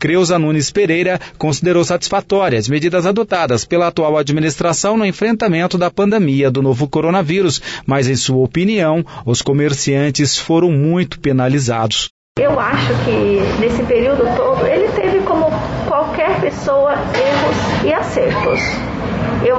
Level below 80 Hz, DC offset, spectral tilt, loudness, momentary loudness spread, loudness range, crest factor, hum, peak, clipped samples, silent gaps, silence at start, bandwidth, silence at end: -38 dBFS; under 0.1%; -5 dB/octave; -15 LUFS; 3 LU; 1 LU; 10 dB; none; -4 dBFS; under 0.1%; 12.10-12.35 s; 0 s; 8 kHz; 0 s